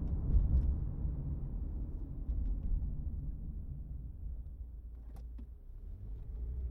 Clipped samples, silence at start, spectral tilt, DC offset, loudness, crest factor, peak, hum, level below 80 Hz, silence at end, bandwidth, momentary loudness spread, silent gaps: under 0.1%; 0 s; -12 dB/octave; under 0.1%; -41 LUFS; 18 dB; -18 dBFS; none; -38 dBFS; 0 s; 1.6 kHz; 16 LU; none